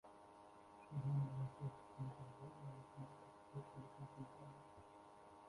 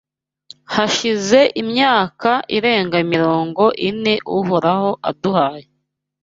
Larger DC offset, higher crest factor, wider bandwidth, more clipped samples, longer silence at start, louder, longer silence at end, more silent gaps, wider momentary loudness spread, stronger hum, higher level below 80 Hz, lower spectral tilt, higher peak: neither; about the same, 18 dB vs 16 dB; first, 11.5 kHz vs 7.8 kHz; neither; second, 0.05 s vs 0.7 s; second, -51 LUFS vs -16 LUFS; second, 0 s vs 0.6 s; neither; first, 19 LU vs 5 LU; neither; second, -78 dBFS vs -58 dBFS; first, -8.5 dB/octave vs -4.5 dB/octave; second, -34 dBFS vs 0 dBFS